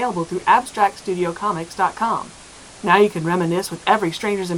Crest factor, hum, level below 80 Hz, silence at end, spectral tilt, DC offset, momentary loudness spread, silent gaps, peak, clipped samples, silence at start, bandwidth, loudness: 20 dB; none; -56 dBFS; 0 s; -5 dB/octave; under 0.1%; 11 LU; none; 0 dBFS; under 0.1%; 0 s; 18 kHz; -20 LUFS